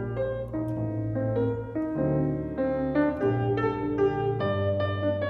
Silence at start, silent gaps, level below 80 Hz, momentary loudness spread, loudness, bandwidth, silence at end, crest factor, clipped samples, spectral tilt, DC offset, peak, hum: 0 s; none; -48 dBFS; 5 LU; -28 LUFS; 5.2 kHz; 0 s; 14 dB; under 0.1%; -10 dB/octave; under 0.1%; -14 dBFS; none